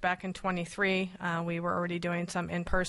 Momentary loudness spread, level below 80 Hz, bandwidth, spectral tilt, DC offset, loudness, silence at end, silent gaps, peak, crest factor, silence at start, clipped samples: 5 LU; -46 dBFS; 11.5 kHz; -5.5 dB/octave; under 0.1%; -32 LUFS; 0 s; none; -14 dBFS; 18 dB; 0 s; under 0.1%